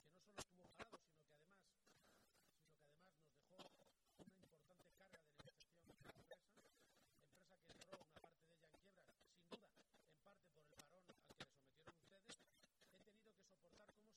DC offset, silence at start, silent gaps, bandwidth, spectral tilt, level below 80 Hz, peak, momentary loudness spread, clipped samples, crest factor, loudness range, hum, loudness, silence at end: under 0.1%; 0 s; none; 18 kHz; -3 dB/octave; -88 dBFS; -40 dBFS; 9 LU; under 0.1%; 30 dB; 3 LU; none; -65 LUFS; 0 s